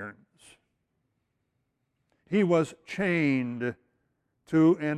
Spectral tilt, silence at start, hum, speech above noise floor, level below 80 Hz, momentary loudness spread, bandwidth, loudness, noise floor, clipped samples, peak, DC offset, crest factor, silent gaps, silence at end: -7.5 dB/octave; 0 s; none; 53 dB; -70 dBFS; 11 LU; 10.5 kHz; -27 LUFS; -78 dBFS; under 0.1%; -12 dBFS; under 0.1%; 18 dB; none; 0 s